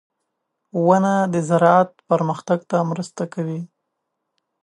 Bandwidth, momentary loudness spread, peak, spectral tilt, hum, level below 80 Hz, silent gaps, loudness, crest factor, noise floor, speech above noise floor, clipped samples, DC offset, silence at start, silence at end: 11 kHz; 13 LU; -2 dBFS; -7 dB/octave; none; -70 dBFS; none; -19 LUFS; 20 dB; -77 dBFS; 59 dB; under 0.1%; under 0.1%; 0.75 s; 0.95 s